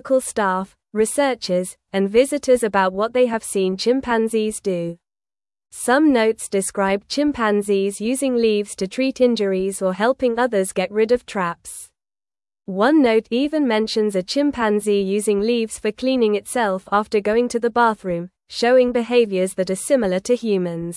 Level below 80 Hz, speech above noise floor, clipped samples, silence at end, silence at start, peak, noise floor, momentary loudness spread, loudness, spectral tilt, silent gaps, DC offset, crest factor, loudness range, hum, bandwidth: -54 dBFS; over 71 dB; under 0.1%; 0 s; 0.05 s; -4 dBFS; under -90 dBFS; 8 LU; -19 LUFS; -4.5 dB/octave; none; under 0.1%; 16 dB; 2 LU; none; 12 kHz